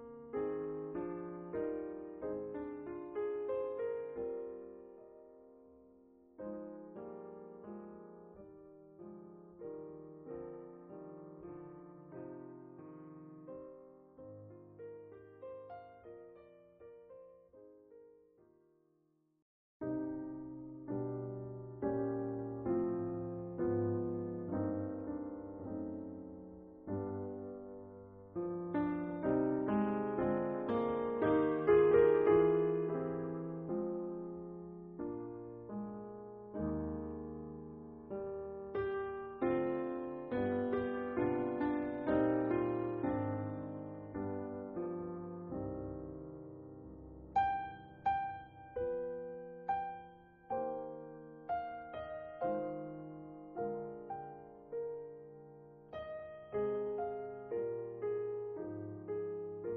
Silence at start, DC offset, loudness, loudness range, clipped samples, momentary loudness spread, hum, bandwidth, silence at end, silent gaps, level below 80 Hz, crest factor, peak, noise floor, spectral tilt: 0 s; under 0.1%; -39 LUFS; 19 LU; under 0.1%; 19 LU; none; 4.2 kHz; 0 s; 19.42-19.80 s; -64 dBFS; 22 dB; -18 dBFS; -76 dBFS; -7.5 dB/octave